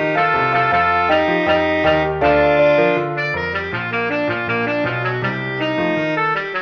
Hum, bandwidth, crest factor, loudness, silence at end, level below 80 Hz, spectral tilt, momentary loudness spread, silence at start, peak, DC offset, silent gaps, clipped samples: none; 6.8 kHz; 14 dB; -17 LUFS; 0 s; -44 dBFS; -7 dB/octave; 7 LU; 0 s; -2 dBFS; under 0.1%; none; under 0.1%